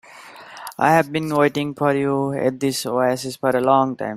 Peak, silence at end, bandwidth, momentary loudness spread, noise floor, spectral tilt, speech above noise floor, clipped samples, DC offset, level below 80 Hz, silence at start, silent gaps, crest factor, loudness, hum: -2 dBFS; 0 s; 16 kHz; 11 LU; -41 dBFS; -5.5 dB/octave; 22 dB; under 0.1%; under 0.1%; -62 dBFS; 0.1 s; none; 18 dB; -20 LUFS; none